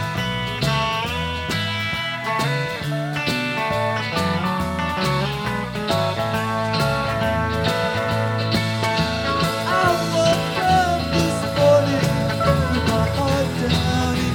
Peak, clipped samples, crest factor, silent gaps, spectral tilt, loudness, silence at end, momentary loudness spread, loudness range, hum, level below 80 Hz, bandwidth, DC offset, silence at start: -4 dBFS; under 0.1%; 16 dB; none; -5 dB/octave; -21 LUFS; 0 s; 5 LU; 4 LU; none; -38 dBFS; 17.5 kHz; under 0.1%; 0 s